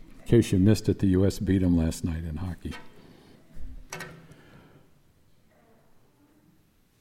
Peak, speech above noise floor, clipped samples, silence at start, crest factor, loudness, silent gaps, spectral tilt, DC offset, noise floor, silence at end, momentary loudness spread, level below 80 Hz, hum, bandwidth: -10 dBFS; 39 dB; under 0.1%; 0.1 s; 18 dB; -25 LUFS; none; -7 dB/octave; under 0.1%; -63 dBFS; 2.85 s; 20 LU; -46 dBFS; none; 16 kHz